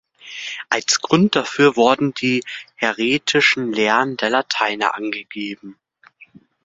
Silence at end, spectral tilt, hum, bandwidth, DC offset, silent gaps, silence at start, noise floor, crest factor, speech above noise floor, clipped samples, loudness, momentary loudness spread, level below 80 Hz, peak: 0.4 s; -3.5 dB/octave; none; 7.8 kHz; under 0.1%; none; 0.25 s; -50 dBFS; 20 dB; 31 dB; under 0.1%; -18 LUFS; 14 LU; -62 dBFS; 0 dBFS